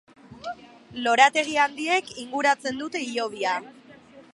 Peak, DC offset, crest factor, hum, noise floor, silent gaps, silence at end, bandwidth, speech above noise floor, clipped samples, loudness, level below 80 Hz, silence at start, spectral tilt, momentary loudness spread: -2 dBFS; under 0.1%; 24 dB; none; -49 dBFS; none; 0.15 s; 11.5 kHz; 26 dB; under 0.1%; -23 LUFS; -68 dBFS; 0.3 s; -2 dB/octave; 19 LU